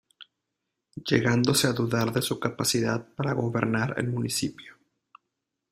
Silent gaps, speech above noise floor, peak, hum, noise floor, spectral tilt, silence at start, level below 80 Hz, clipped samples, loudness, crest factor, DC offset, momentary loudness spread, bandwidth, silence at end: none; 57 dB; -6 dBFS; none; -83 dBFS; -4.5 dB/octave; 0.2 s; -60 dBFS; under 0.1%; -26 LUFS; 22 dB; under 0.1%; 7 LU; 16 kHz; 1 s